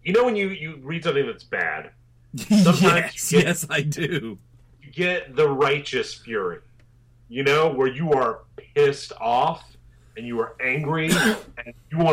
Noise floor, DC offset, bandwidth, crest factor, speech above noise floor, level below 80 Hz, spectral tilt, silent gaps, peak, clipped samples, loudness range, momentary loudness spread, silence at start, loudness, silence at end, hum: -54 dBFS; under 0.1%; 16 kHz; 18 dB; 32 dB; -54 dBFS; -5 dB/octave; none; -6 dBFS; under 0.1%; 4 LU; 16 LU; 0.05 s; -22 LUFS; 0 s; none